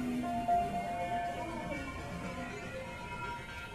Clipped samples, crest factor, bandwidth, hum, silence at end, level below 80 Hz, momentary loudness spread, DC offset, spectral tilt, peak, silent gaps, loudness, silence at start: under 0.1%; 16 dB; 15 kHz; none; 0 s; -52 dBFS; 10 LU; under 0.1%; -5.5 dB/octave; -22 dBFS; none; -38 LUFS; 0 s